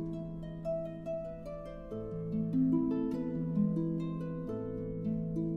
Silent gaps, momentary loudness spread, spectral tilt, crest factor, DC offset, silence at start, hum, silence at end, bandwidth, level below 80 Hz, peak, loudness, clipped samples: none; 12 LU; -11 dB/octave; 16 dB; under 0.1%; 0 s; none; 0 s; 5.2 kHz; -54 dBFS; -20 dBFS; -36 LUFS; under 0.1%